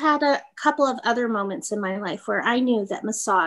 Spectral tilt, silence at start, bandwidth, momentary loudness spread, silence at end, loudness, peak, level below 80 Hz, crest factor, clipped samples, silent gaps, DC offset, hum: -3.5 dB/octave; 0 s; 12.5 kHz; 6 LU; 0 s; -23 LUFS; -6 dBFS; -74 dBFS; 18 dB; under 0.1%; none; under 0.1%; none